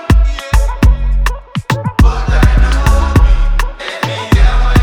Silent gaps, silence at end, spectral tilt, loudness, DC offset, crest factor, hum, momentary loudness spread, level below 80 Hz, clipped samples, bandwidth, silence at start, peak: none; 0 s; -6 dB/octave; -13 LUFS; under 0.1%; 10 dB; none; 7 LU; -10 dBFS; under 0.1%; 14 kHz; 0 s; 0 dBFS